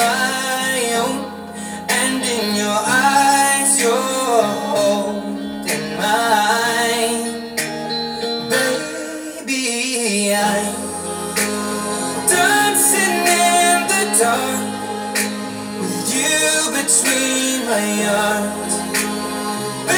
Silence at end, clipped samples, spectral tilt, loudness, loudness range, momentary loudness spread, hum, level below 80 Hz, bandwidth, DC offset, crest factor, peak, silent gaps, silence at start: 0 s; under 0.1%; -2 dB/octave; -17 LUFS; 5 LU; 11 LU; none; -60 dBFS; over 20 kHz; under 0.1%; 18 dB; 0 dBFS; none; 0 s